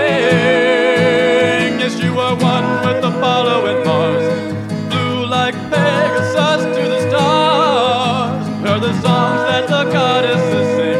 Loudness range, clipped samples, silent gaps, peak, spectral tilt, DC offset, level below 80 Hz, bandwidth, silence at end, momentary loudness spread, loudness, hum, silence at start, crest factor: 2 LU; under 0.1%; none; 0 dBFS; -5.5 dB/octave; under 0.1%; -56 dBFS; 12 kHz; 0 s; 5 LU; -14 LUFS; none; 0 s; 14 dB